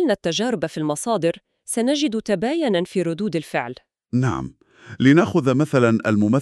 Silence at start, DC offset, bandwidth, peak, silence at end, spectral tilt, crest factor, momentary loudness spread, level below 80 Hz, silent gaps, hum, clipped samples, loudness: 0 s; under 0.1%; 13 kHz; -2 dBFS; 0 s; -6 dB/octave; 18 dB; 10 LU; -56 dBFS; none; none; under 0.1%; -21 LUFS